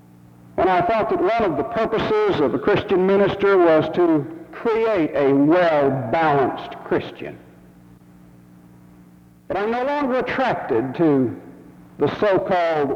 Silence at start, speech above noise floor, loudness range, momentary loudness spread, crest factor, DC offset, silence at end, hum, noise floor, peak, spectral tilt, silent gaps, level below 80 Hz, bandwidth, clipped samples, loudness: 0.55 s; 30 dB; 9 LU; 9 LU; 14 dB; under 0.1%; 0 s; none; -48 dBFS; -6 dBFS; -8 dB/octave; none; -52 dBFS; 7.2 kHz; under 0.1%; -19 LUFS